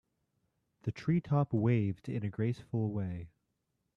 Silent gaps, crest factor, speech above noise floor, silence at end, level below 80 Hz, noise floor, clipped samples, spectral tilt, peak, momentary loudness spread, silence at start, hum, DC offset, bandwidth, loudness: none; 18 dB; 50 dB; 0.7 s; -66 dBFS; -82 dBFS; under 0.1%; -9.5 dB/octave; -18 dBFS; 12 LU; 0.85 s; none; under 0.1%; 7 kHz; -34 LUFS